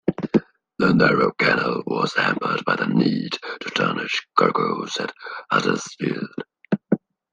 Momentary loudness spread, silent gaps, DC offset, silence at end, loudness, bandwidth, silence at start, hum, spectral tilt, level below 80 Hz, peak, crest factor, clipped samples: 10 LU; none; under 0.1%; 0.35 s; -22 LUFS; 9.8 kHz; 0.05 s; none; -5.5 dB/octave; -58 dBFS; -2 dBFS; 20 dB; under 0.1%